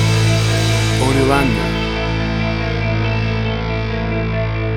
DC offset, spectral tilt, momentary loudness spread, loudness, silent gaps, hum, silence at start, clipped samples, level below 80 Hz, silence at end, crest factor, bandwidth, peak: under 0.1%; -5.5 dB/octave; 6 LU; -17 LUFS; none; none; 0 s; under 0.1%; -26 dBFS; 0 s; 16 dB; 13.5 kHz; 0 dBFS